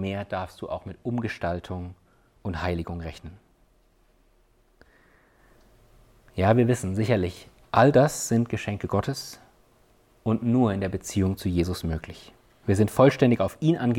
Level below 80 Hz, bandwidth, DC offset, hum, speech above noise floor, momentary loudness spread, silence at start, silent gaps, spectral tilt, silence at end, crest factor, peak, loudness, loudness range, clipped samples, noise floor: -48 dBFS; 17 kHz; under 0.1%; none; 38 dB; 18 LU; 0 s; none; -6.5 dB/octave; 0 s; 20 dB; -6 dBFS; -25 LUFS; 13 LU; under 0.1%; -62 dBFS